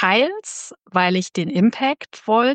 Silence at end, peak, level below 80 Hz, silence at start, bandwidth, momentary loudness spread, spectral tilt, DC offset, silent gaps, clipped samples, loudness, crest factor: 0 s; -2 dBFS; -70 dBFS; 0 s; 9.8 kHz; 12 LU; -4.5 dB/octave; under 0.1%; none; under 0.1%; -20 LUFS; 18 dB